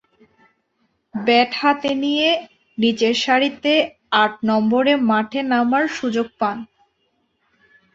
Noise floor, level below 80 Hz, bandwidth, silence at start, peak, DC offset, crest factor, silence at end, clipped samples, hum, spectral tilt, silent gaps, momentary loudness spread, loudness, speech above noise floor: -68 dBFS; -64 dBFS; 7.8 kHz; 1.15 s; -2 dBFS; under 0.1%; 18 dB; 1.3 s; under 0.1%; none; -4.5 dB/octave; none; 7 LU; -18 LUFS; 50 dB